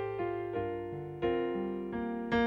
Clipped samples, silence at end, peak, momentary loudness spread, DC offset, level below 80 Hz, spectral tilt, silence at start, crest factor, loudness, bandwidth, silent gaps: under 0.1%; 0 s; -18 dBFS; 5 LU; under 0.1%; -58 dBFS; -8 dB/octave; 0 s; 16 dB; -35 LUFS; 7 kHz; none